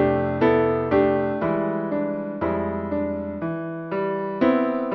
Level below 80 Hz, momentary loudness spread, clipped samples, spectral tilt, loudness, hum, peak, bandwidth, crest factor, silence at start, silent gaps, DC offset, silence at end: -50 dBFS; 9 LU; under 0.1%; -10 dB/octave; -23 LUFS; none; -6 dBFS; 5.8 kHz; 16 dB; 0 s; none; under 0.1%; 0 s